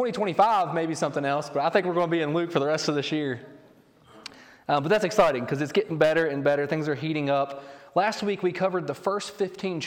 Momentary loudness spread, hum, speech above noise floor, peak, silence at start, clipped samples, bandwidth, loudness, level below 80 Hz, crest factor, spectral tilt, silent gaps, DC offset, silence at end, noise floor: 9 LU; none; 31 dB; -6 dBFS; 0 s; under 0.1%; 17 kHz; -25 LUFS; -64 dBFS; 20 dB; -5.5 dB/octave; none; under 0.1%; 0 s; -56 dBFS